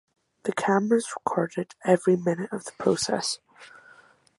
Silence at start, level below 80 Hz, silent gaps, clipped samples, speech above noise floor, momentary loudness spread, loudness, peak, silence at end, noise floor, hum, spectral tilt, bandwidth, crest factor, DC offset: 0.45 s; -68 dBFS; none; under 0.1%; 31 dB; 9 LU; -26 LUFS; -6 dBFS; 0.7 s; -56 dBFS; none; -5 dB/octave; 11.5 kHz; 20 dB; under 0.1%